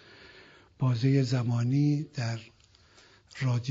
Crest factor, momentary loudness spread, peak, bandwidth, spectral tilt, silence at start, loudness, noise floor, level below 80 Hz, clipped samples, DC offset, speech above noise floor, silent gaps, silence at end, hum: 16 dB; 10 LU; -14 dBFS; 7.8 kHz; -7.5 dB/octave; 0.35 s; -28 LUFS; -59 dBFS; -66 dBFS; under 0.1%; under 0.1%; 32 dB; none; 0 s; none